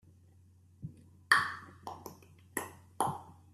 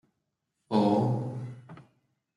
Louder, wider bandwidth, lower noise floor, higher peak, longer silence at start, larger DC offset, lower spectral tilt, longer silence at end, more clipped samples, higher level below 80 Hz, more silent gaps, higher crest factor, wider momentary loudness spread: second, -33 LUFS vs -28 LUFS; first, 15 kHz vs 11 kHz; second, -62 dBFS vs -82 dBFS; first, -8 dBFS vs -12 dBFS; about the same, 0.8 s vs 0.7 s; neither; second, -2.5 dB/octave vs -9 dB/octave; second, 0.2 s vs 0.55 s; neither; about the same, -74 dBFS vs -72 dBFS; neither; first, 30 dB vs 18 dB; first, 22 LU vs 18 LU